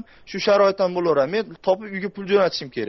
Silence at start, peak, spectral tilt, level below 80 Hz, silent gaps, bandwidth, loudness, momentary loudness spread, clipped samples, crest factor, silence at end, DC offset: 0.25 s; -6 dBFS; -3.5 dB/octave; -60 dBFS; none; 6.2 kHz; -21 LUFS; 10 LU; under 0.1%; 14 dB; 0 s; under 0.1%